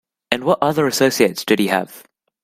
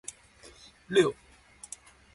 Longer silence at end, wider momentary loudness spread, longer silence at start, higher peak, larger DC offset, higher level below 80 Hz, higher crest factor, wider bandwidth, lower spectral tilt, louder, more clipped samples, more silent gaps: second, 0.45 s vs 1 s; second, 7 LU vs 25 LU; second, 0.3 s vs 0.9 s; first, 0 dBFS vs -12 dBFS; neither; first, -58 dBFS vs -64 dBFS; about the same, 18 dB vs 22 dB; first, 16 kHz vs 11.5 kHz; about the same, -4 dB/octave vs -4 dB/octave; first, -17 LUFS vs -27 LUFS; neither; neither